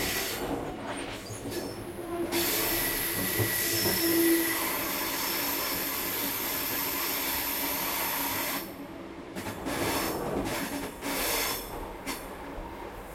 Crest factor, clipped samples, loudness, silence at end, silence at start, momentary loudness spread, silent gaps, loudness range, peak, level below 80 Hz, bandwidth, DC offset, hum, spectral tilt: 18 dB; under 0.1%; -29 LUFS; 0 s; 0 s; 13 LU; none; 5 LU; -14 dBFS; -50 dBFS; 16.5 kHz; under 0.1%; none; -2.5 dB/octave